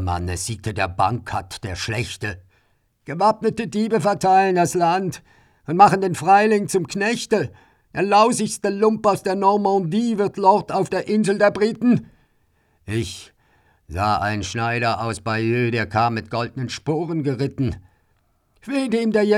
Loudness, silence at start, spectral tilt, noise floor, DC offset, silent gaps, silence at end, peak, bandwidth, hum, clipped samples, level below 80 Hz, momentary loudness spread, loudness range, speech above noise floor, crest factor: -20 LUFS; 0 s; -5.5 dB/octave; -64 dBFS; under 0.1%; none; 0 s; 0 dBFS; 14.5 kHz; none; under 0.1%; -52 dBFS; 12 LU; 6 LU; 44 dB; 20 dB